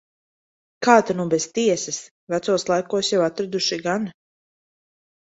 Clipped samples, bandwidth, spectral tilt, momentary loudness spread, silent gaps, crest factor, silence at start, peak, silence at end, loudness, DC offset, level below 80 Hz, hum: under 0.1%; 8.2 kHz; -3.5 dB/octave; 11 LU; 2.11-2.27 s; 22 dB; 0.8 s; -2 dBFS; 1.2 s; -21 LUFS; under 0.1%; -66 dBFS; none